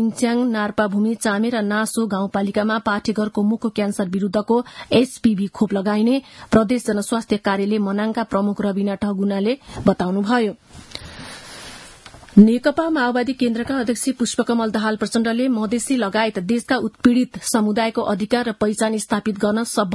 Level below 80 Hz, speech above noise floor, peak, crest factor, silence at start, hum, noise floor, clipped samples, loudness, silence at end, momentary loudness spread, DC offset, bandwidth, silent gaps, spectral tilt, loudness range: -52 dBFS; 23 dB; 0 dBFS; 20 dB; 0 s; none; -42 dBFS; under 0.1%; -20 LUFS; 0 s; 5 LU; under 0.1%; 12 kHz; none; -5.5 dB/octave; 2 LU